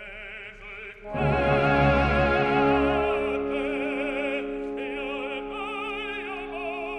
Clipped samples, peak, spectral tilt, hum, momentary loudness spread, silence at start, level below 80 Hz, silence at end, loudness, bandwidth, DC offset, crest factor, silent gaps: under 0.1%; -8 dBFS; -7.5 dB/octave; none; 16 LU; 0 s; -40 dBFS; 0 s; -26 LUFS; 9.4 kHz; under 0.1%; 18 dB; none